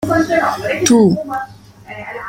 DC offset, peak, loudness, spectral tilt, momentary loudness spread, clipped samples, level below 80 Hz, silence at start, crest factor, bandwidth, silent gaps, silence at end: under 0.1%; -2 dBFS; -14 LUFS; -4.5 dB/octave; 20 LU; under 0.1%; -48 dBFS; 0 s; 14 dB; 16.5 kHz; none; 0 s